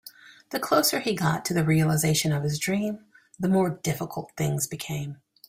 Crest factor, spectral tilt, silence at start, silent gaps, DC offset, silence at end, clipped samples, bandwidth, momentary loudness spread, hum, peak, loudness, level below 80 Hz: 18 dB; -5 dB/octave; 0.05 s; none; under 0.1%; 0.35 s; under 0.1%; 16 kHz; 12 LU; none; -8 dBFS; -26 LUFS; -58 dBFS